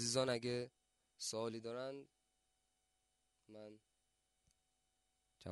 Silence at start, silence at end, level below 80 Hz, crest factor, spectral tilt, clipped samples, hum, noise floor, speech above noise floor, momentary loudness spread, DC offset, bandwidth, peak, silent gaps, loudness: 0 s; 0 s; -84 dBFS; 24 dB; -3.5 dB/octave; under 0.1%; none; -85 dBFS; 41 dB; 20 LU; under 0.1%; 11.5 kHz; -24 dBFS; none; -43 LUFS